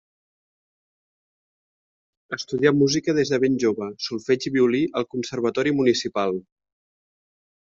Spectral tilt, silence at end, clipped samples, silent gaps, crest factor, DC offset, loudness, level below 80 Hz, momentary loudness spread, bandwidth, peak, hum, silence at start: -5 dB/octave; 1.3 s; under 0.1%; none; 20 dB; under 0.1%; -22 LUFS; -62 dBFS; 9 LU; 7.6 kHz; -4 dBFS; none; 2.3 s